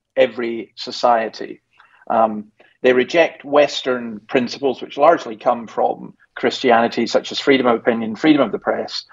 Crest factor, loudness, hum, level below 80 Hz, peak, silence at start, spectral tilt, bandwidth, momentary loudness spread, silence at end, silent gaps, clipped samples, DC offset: 18 dB; -18 LUFS; none; -66 dBFS; 0 dBFS; 0.15 s; -4.5 dB/octave; 7.8 kHz; 11 LU; 0.1 s; none; under 0.1%; under 0.1%